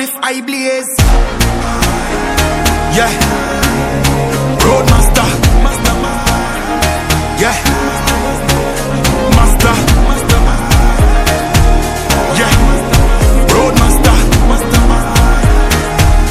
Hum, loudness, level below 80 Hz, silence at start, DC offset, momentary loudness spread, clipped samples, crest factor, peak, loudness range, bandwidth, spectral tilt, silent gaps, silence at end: none; -11 LUFS; -12 dBFS; 0 s; under 0.1%; 5 LU; 0.1%; 10 dB; 0 dBFS; 3 LU; 16 kHz; -4.5 dB/octave; none; 0 s